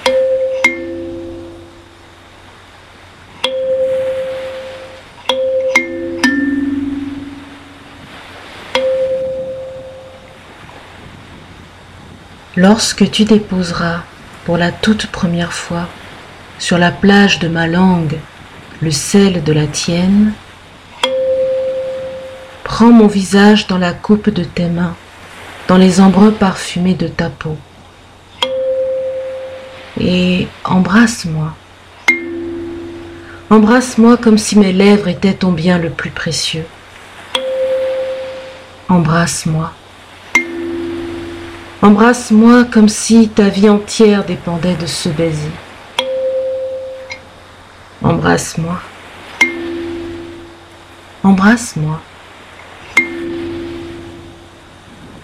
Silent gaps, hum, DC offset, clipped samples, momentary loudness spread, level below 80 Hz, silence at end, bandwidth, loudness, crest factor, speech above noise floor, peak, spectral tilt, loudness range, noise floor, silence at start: none; none; under 0.1%; under 0.1%; 22 LU; -42 dBFS; 0.05 s; 14.5 kHz; -13 LUFS; 14 dB; 29 dB; 0 dBFS; -5.5 dB/octave; 10 LU; -40 dBFS; 0 s